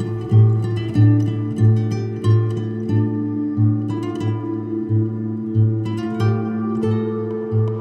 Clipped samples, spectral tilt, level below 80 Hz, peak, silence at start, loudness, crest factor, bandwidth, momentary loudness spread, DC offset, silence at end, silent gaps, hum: under 0.1%; -9.5 dB/octave; -54 dBFS; -4 dBFS; 0 s; -20 LUFS; 14 dB; 6.4 kHz; 8 LU; under 0.1%; 0 s; none; none